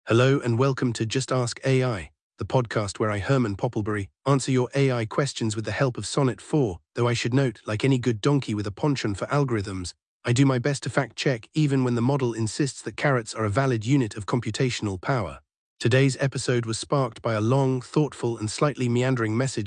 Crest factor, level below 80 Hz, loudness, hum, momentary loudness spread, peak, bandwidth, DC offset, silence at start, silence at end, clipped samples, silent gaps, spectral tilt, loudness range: 18 dB; -58 dBFS; -25 LUFS; none; 6 LU; -8 dBFS; 10.5 kHz; under 0.1%; 0.05 s; 0 s; under 0.1%; 2.21-2.30 s, 10.07-10.20 s, 15.57-15.77 s; -6 dB/octave; 1 LU